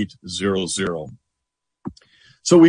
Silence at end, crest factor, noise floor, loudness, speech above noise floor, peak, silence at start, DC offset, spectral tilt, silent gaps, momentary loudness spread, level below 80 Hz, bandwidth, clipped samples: 0 s; 18 dB; -81 dBFS; -23 LUFS; 56 dB; -2 dBFS; 0 s; under 0.1%; -5 dB/octave; none; 17 LU; -56 dBFS; 10.5 kHz; under 0.1%